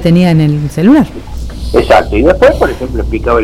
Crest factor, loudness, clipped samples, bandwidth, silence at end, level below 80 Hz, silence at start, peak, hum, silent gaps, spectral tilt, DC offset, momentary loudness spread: 8 dB; -9 LUFS; 0.1%; 15 kHz; 0 s; -20 dBFS; 0 s; 0 dBFS; none; none; -7.5 dB/octave; under 0.1%; 10 LU